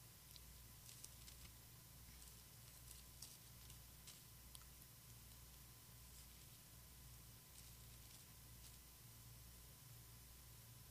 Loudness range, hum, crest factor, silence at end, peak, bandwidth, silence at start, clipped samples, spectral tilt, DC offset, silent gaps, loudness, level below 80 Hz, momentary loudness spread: 1 LU; none; 28 dB; 0 s; -34 dBFS; 15.5 kHz; 0 s; under 0.1%; -2.5 dB/octave; under 0.1%; none; -60 LUFS; -68 dBFS; 3 LU